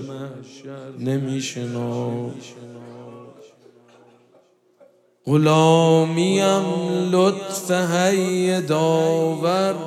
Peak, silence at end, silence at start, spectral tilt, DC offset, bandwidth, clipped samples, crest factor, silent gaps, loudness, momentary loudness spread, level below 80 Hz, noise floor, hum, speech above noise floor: -4 dBFS; 0 s; 0 s; -5.5 dB/octave; under 0.1%; 14.5 kHz; under 0.1%; 18 dB; none; -20 LUFS; 23 LU; -72 dBFS; -57 dBFS; none; 37 dB